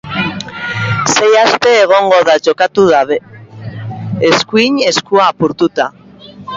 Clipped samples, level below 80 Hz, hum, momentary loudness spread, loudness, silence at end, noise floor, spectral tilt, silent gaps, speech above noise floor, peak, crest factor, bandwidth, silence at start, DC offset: under 0.1%; -48 dBFS; none; 14 LU; -11 LUFS; 0 s; -33 dBFS; -4 dB/octave; none; 23 dB; 0 dBFS; 12 dB; 8 kHz; 0.05 s; under 0.1%